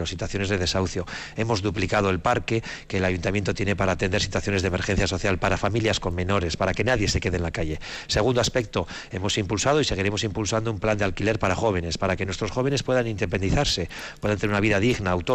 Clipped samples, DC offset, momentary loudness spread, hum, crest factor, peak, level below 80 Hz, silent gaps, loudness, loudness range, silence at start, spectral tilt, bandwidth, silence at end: under 0.1%; under 0.1%; 6 LU; none; 14 dB; -10 dBFS; -40 dBFS; none; -24 LUFS; 1 LU; 0 s; -5 dB/octave; 12 kHz; 0 s